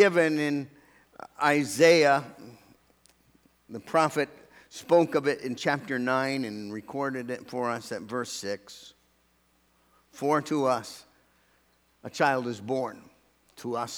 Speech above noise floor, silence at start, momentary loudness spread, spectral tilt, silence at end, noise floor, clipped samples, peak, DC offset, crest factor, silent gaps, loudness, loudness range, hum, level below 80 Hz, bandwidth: 40 dB; 0 s; 23 LU; -4.5 dB/octave; 0 s; -67 dBFS; under 0.1%; -6 dBFS; under 0.1%; 22 dB; none; -27 LUFS; 8 LU; none; -74 dBFS; over 20 kHz